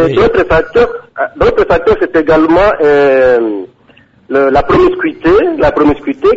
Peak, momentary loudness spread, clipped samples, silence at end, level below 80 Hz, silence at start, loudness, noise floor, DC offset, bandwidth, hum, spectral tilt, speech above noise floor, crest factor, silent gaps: 0 dBFS; 6 LU; under 0.1%; 0 s; -30 dBFS; 0 s; -10 LUFS; -45 dBFS; under 0.1%; 7.8 kHz; none; -7.5 dB/octave; 36 dB; 10 dB; none